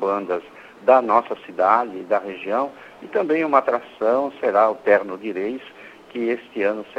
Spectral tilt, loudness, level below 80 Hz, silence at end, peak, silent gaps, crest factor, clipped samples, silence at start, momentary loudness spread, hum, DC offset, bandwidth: -6.5 dB/octave; -21 LUFS; -68 dBFS; 0.05 s; -2 dBFS; none; 20 dB; under 0.1%; 0 s; 12 LU; none; under 0.1%; 8 kHz